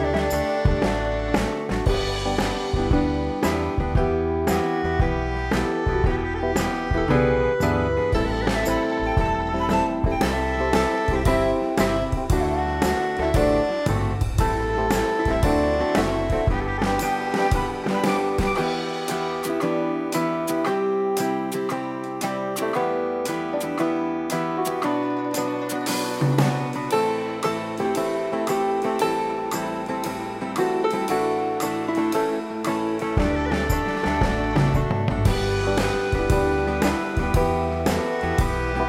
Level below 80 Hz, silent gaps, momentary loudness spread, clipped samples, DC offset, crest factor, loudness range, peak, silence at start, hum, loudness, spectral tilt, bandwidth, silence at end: -32 dBFS; none; 5 LU; under 0.1%; under 0.1%; 18 dB; 3 LU; -4 dBFS; 0 s; none; -23 LUFS; -6 dB/octave; 16.5 kHz; 0 s